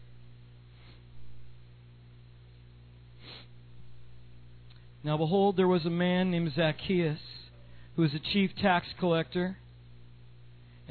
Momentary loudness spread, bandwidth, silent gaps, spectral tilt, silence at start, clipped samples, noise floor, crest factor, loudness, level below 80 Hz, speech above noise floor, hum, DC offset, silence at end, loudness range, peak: 21 LU; 4.6 kHz; none; -9.5 dB/octave; 0 s; under 0.1%; -53 dBFS; 18 dB; -29 LUFS; -58 dBFS; 25 dB; 60 Hz at -55 dBFS; under 0.1%; 0 s; 4 LU; -14 dBFS